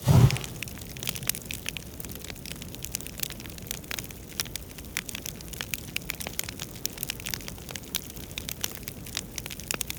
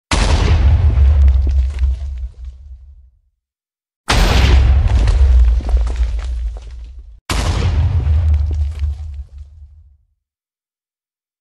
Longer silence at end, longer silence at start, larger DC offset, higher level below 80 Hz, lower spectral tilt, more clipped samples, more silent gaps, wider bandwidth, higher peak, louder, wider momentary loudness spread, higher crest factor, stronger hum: second, 0 s vs 1.75 s; about the same, 0 s vs 0.1 s; neither; second, -46 dBFS vs -16 dBFS; second, -4 dB/octave vs -5.5 dB/octave; neither; second, none vs 3.96-4.04 s, 7.21-7.26 s; first, over 20 kHz vs 11.5 kHz; second, -6 dBFS vs 0 dBFS; second, -32 LUFS vs -15 LUFS; second, 7 LU vs 20 LU; first, 26 dB vs 14 dB; neither